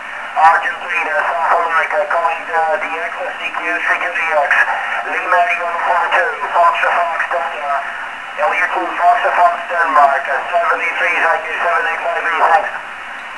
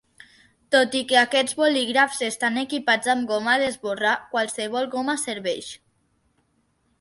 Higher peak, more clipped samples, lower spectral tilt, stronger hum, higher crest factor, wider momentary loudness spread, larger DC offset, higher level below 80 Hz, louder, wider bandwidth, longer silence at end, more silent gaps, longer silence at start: first, 0 dBFS vs -4 dBFS; neither; about the same, -1.5 dB/octave vs -2 dB/octave; neither; about the same, 16 dB vs 20 dB; about the same, 8 LU vs 7 LU; first, 0.4% vs under 0.1%; first, -58 dBFS vs -68 dBFS; first, -15 LUFS vs -22 LUFS; about the same, 11 kHz vs 11.5 kHz; second, 0 s vs 1.25 s; neither; second, 0 s vs 0.7 s